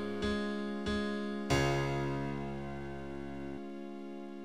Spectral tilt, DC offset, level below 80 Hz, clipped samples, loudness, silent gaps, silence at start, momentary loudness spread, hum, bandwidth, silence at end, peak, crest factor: -6 dB/octave; 0.3%; -52 dBFS; under 0.1%; -37 LUFS; none; 0 s; 13 LU; none; 15.5 kHz; 0 s; -16 dBFS; 20 dB